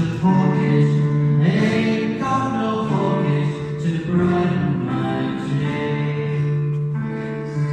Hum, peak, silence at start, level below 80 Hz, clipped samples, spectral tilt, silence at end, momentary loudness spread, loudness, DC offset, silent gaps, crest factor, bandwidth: none; -6 dBFS; 0 s; -50 dBFS; under 0.1%; -8 dB/octave; 0 s; 7 LU; -20 LUFS; under 0.1%; none; 14 dB; 8.6 kHz